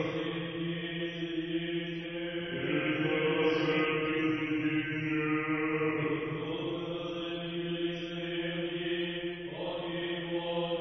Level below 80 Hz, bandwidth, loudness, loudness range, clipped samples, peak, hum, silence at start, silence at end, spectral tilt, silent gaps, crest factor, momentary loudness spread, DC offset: -62 dBFS; 6.2 kHz; -33 LUFS; 5 LU; under 0.1%; -18 dBFS; none; 0 s; 0 s; -7.5 dB/octave; none; 14 dB; 7 LU; under 0.1%